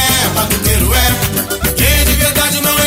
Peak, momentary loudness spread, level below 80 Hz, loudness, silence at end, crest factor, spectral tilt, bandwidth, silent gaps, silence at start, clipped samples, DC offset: -2 dBFS; 5 LU; -18 dBFS; -11 LUFS; 0 s; 12 dB; -3 dB/octave; 16.5 kHz; none; 0 s; under 0.1%; under 0.1%